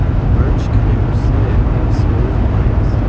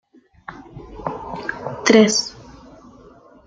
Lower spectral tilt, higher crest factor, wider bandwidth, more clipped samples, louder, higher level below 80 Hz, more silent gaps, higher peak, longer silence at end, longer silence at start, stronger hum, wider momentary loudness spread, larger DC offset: first, -9.5 dB/octave vs -3.5 dB/octave; second, 10 dB vs 22 dB; second, 7 kHz vs 9.4 kHz; neither; first, -15 LUFS vs -18 LUFS; first, -16 dBFS vs -50 dBFS; neither; about the same, -2 dBFS vs 0 dBFS; second, 0 s vs 0.95 s; second, 0 s vs 0.5 s; neither; second, 1 LU vs 26 LU; first, 0.6% vs under 0.1%